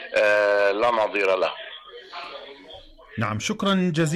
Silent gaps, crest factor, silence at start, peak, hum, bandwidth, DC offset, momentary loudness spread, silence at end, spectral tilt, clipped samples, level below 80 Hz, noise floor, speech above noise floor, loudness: none; 12 dB; 0 s; -12 dBFS; none; 14 kHz; under 0.1%; 20 LU; 0 s; -5 dB/octave; under 0.1%; -58 dBFS; -45 dBFS; 24 dB; -22 LUFS